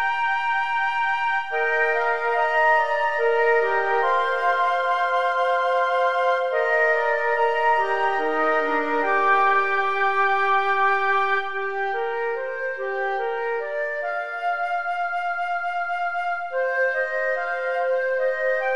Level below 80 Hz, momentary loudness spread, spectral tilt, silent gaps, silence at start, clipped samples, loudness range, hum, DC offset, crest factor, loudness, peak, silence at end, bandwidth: -74 dBFS; 7 LU; -3 dB/octave; none; 0 s; under 0.1%; 5 LU; none; 1%; 14 dB; -22 LUFS; -8 dBFS; 0 s; 11 kHz